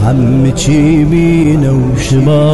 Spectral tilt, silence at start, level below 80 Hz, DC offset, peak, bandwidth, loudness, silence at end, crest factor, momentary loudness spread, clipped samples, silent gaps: -7 dB/octave; 0 s; -26 dBFS; 4%; -2 dBFS; 12 kHz; -9 LUFS; 0 s; 6 dB; 2 LU; under 0.1%; none